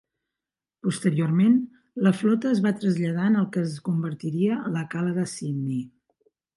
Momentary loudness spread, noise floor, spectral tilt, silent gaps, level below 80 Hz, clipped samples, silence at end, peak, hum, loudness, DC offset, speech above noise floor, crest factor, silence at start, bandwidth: 9 LU; -89 dBFS; -7 dB/octave; none; -70 dBFS; under 0.1%; 0.7 s; -8 dBFS; none; -25 LUFS; under 0.1%; 66 dB; 18 dB; 0.85 s; 11.5 kHz